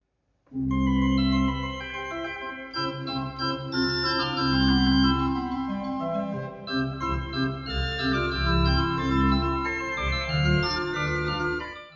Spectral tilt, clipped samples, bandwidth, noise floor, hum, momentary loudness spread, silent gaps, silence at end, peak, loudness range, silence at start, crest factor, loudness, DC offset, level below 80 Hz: -6.5 dB/octave; under 0.1%; 7.2 kHz; -69 dBFS; none; 10 LU; none; 0 s; -10 dBFS; 3 LU; 0.5 s; 16 dB; -26 LUFS; under 0.1%; -34 dBFS